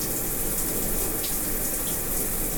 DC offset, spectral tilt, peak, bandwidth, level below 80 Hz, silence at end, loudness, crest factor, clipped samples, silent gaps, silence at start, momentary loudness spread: under 0.1%; -2.5 dB/octave; -12 dBFS; 19.5 kHz; -34 dBFS; 0 s; -25 LUFS; 14 dB; under 0.1%; none; 0 s; 1 LU